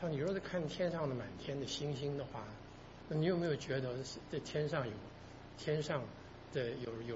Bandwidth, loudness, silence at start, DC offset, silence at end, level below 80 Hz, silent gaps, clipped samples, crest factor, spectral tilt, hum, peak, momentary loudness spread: 7.6 kHz; -40 LUFS; 0 s; under 0.1%; 0 s; -62 dBFS; none; under 0.1%; 18 dB; -5.5 dB/octave; none; -22 dBFS; 15 LU